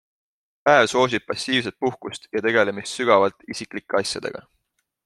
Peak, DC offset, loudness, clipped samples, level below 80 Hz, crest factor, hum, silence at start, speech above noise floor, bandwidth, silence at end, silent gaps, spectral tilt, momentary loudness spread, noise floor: -2 dBFS; under 0.1%; -21 LUFS; under 0.1%; -64 dBFS; 20 dB; none; 0.65 s; 52 dB; 12.5 kHz; 0.65 s; none; -3.5 dB/octave; 15 LU; -74 dBFS